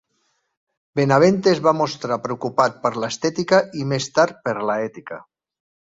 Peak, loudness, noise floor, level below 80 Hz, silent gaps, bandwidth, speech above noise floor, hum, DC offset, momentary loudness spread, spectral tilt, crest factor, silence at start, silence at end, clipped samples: -2 dBFS; -20 LUFS; -69 dBFS; -62 dBFS; none; 7.8 kHz; 50 dB; none; under 0.1%; 11 LU; -5.5 dB/octave; 18 dB; 0.95 s; 0.75 s; under 0.1%